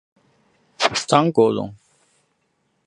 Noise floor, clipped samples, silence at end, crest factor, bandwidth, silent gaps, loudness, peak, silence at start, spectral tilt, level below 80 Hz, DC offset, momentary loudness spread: -69 dBFS; under 0.1%; 1.15 s; 22 dB; 11 kHz; none; -19 LUFS; 0 dBFS; 0.8 s; -4.5 dB/octave; -60 dBFS; under 0.1%; 11 LU